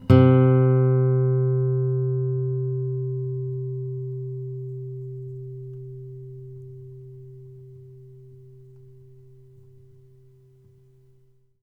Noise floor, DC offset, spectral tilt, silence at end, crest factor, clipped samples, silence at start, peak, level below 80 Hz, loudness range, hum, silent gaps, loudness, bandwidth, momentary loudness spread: -58 dBFS; under 0.1%; -11 dB/octave; 3 s; 22 dB; under 0.1%; 0 s; -2 dBFS; -54 dBFS; 24 LU; none; none; -23 LUFS; 3.6 kHz; 25 LU